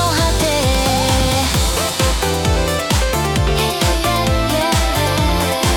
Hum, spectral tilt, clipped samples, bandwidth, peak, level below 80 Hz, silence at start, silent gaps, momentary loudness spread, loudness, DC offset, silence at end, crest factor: none; -4 dB/octave; under 0.1%; 18 kHz; -4 dBFS; -22 dBFS; 0 s; none; 2 LU; -16 LUFS; under 0.1%; 0 s; 12 dB